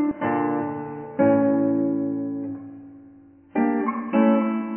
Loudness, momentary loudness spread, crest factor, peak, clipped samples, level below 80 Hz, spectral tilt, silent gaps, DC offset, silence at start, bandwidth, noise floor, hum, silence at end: -23 LUFS; 14 LU; 16 dB; -8 dBFS; under 0.1%; -64 dBFS; -11.5 dB/octave; none; under 0.1%; 0 s; 3.2 kHz; -49 dBFS; none; 0 s